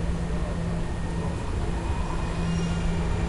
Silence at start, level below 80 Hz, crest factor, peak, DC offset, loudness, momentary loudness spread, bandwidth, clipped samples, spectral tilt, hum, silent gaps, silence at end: 0 s; -30 dBFS; 12 dB; -14 dBFS; under 0.1%; -29 LUFS; 3 LU; 11.5 kHz; under 0.1%; -6.5 dB/octave; none; none; 0 s